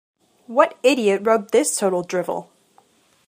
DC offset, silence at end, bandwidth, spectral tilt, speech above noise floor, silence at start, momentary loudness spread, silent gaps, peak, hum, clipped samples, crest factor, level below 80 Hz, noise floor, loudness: under 0.1%; 0.85 s; 15.5 kHz; -3.5 dB/octave; 39 dB; 0.5 s; 8 LU; none; 0 dBFS; none; under 0.1%; 20 dB; -74 dBFS; -58 dBFS; -19 LUFS